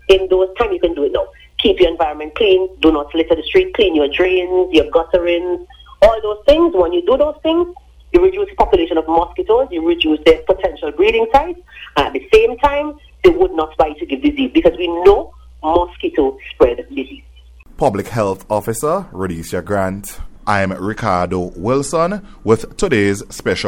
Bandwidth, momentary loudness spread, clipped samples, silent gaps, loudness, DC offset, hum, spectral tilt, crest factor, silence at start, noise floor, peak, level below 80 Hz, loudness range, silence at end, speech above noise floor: 17 kHz; 9 LU; under 0.1%; none; -15 LUFS; under 0.1%; none; -5.5 dB/octave; 16 dB; 0.1 s; -41 dBFS; 0 dBFS; -34 dBFS; 5 LU; 0 s; 26 dB